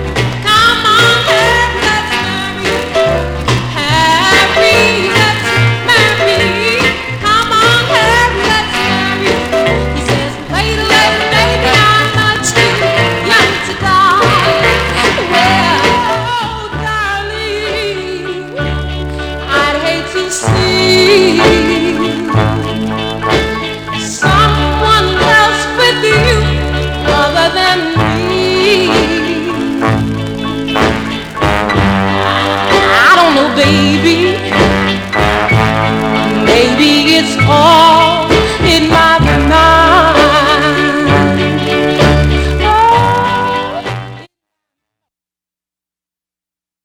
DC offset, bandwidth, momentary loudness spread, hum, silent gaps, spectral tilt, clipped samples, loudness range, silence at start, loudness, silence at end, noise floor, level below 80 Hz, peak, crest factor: under 0.1%; over 20 kHz; 9 LU; none; none; -4.5 dB/octave; 0.4%; 6 LU; 0 s; -10 LUFS; 2.6 s; -88 dBFS; -26 dBFS; 0 dBFS; 10 dB